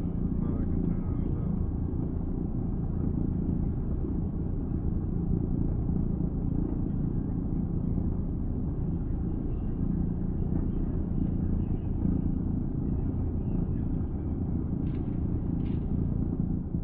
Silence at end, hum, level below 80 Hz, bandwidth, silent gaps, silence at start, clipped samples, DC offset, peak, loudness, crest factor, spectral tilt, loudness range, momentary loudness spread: 0 s; none; -34 dBFS; 3 kHz; none; 0 s; under 0.1%; under 0.1%; -14 dBFS; -31 LUFS; 14 dB; -13 dB/octave; 1 LU; 2 LU